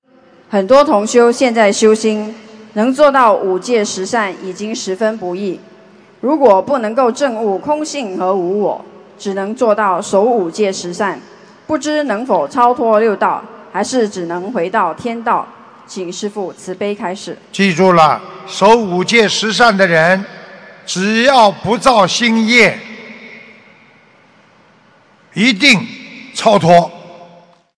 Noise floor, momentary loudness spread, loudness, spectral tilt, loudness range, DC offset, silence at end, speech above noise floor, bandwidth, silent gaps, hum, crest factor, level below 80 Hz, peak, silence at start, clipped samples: -48 dBFS; 15 LU; -13 LUFS; -4 dB/octave; 6 LU; under 0.1%; 0.55 s; 36 dB; 11 kHz; none; none; 14 dB; -54 dBFS; 0 dBFS; 0.5 s; 0.5%